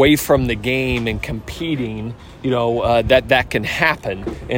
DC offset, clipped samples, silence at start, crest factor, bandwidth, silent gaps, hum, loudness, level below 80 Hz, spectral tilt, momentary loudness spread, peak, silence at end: under 0.1%; under 0.1%; 0 s; 18 dB; 16.5 kHz; none; none; -18 LUFS; -34 dBFS; -5 dB/octave; 13 LU; 0 dBFS; 0 s